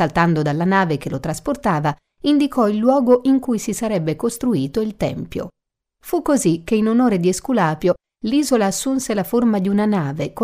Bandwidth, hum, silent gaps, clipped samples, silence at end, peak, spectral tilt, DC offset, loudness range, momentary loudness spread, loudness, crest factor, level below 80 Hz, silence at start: 16 kHz; none; none; under 0.1%; 0 s; -2 dBFS; -6 dB/octave; under 0.1%; 3 LU; 8 LU; -19 LUFS; 16 dB; -48 dBFS; 0 s